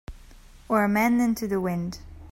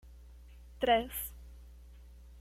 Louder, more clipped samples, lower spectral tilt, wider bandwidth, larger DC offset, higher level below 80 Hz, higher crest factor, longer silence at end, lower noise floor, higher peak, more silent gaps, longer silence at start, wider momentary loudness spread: first, -25 LUFS vs -33 LUFS; neither; first, -6.5 dB/octave vs -3.5 dB/octave; about the same, 16.5 kHz vs 16.5 kHz; neither; about the same, -48 dBFS vs -52 dBFS; about the same, 16 dB vs 20 dB; about the same, 0 s vs 0 s; second, -48 dBFS vs -53 dBFS; first, -10 dBFS vs -16 dBFS; neither; about the same, 0.1 s vs 0.05 s; second, 12 LU vs 27 LU